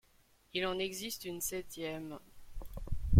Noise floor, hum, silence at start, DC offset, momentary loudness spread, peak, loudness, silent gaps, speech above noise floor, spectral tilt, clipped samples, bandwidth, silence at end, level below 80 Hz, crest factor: -68 dBFS; none; 0.55 s; under 0.1%; 16 LU; -12 dBFS; -39 LUFS; none; 29 dB; -4.5 dB/octave; under 0.1%; 16.5 kHz; 0 s; -46 dBFS; 24 dB